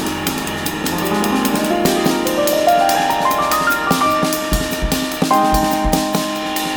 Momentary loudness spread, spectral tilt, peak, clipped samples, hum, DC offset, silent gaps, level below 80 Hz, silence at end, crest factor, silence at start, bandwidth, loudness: 6 LU; -4 dB/octave; -2 dBFS; under 0.1%; none; under 0.1%; none; -32 dBFS; 0 s; 16 dB; 0 s; over 20 kHz; -16 LUFS